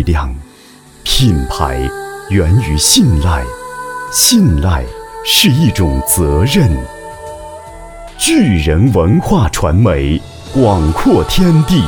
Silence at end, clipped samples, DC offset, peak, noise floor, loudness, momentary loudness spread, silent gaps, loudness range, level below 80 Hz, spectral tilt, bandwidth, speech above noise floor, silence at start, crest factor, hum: 0 s; under 0.1%; under 0.1%; 0 dBFS; -40 dBFS; -11 LUFS; 19 LU; none; 2 LU; -22 dBFS; -4.5 dB/octave; 20 kHz; 29 dB; 0 s; 12 dB; none